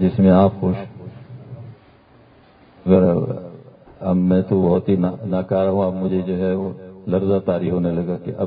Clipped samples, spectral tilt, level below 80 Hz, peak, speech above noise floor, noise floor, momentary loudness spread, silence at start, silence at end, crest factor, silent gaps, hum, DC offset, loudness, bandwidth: under 0.1%; -13.5 dB/octave; -42 dBFS; -2 dBFS; 32 dB; -50 dBFS; 22 LU; 0 s; 0 s; 18 dB; none; none; under 0.1%; -19 LUFS; 4.3 kHz